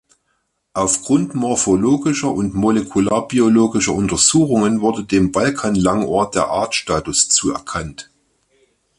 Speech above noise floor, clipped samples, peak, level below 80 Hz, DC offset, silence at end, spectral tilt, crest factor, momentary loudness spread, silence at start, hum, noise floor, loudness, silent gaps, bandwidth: 52 dB; under 0.1%; 0 dBFS; -44 dBFS; under 0.1%; 0.95 s; -4 dB/octave; 18 dB; 7 LU; 0.75 s; none; -68 dBFS; -16 LUFS; none; 11.5 kHz